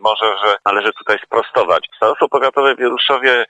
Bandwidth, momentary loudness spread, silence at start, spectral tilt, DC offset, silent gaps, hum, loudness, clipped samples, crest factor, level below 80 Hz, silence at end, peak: 9 kHz; 4 LU; 0.05 s; -3.5 dB/octave; under 0.1%; none; none; -15 LUFS; under 0.1%; 14 dB; -62 dBFS; 0.05 s; 0 dBFS